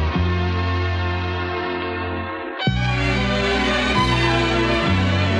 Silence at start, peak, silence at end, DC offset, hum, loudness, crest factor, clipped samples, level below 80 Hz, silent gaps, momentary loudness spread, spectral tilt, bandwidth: 0 s; -6 dBFS; 0 s; under 0.1%; none; -20 LUFS; 14 dB; under 0.1%; -32 dBFS; none; 7 LU; -6 dB/octave; 10 kHz